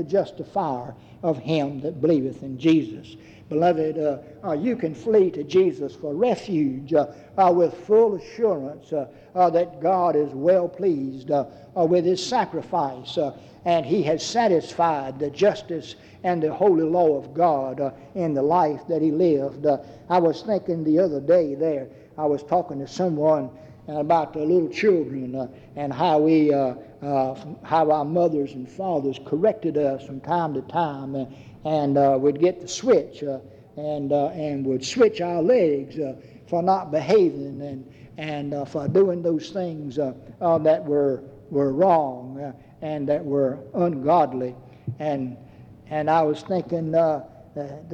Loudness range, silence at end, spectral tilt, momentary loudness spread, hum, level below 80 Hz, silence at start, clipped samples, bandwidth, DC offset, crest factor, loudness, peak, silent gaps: 3 LU; 0 s; -7 dB/octave; 12 LU; none; -62 dBFS; 0 s; under 0.1%; 8.6 kHz; under 0.1%; 16 dB; -23 LUFS; -6 dBFS; none